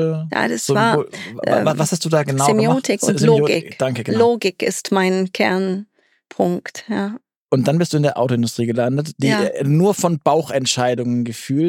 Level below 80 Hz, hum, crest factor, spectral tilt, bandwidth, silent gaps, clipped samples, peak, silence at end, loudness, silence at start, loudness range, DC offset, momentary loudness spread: -66 dBFS; none; 16 dB; -5.5 dB/octave; 17 kHz; 7.36-7.49 s; under 0.1%; -2 dBFS; 0 s; -18 LUFS; 0 s; 4 LU; under 0.1%; 8 LU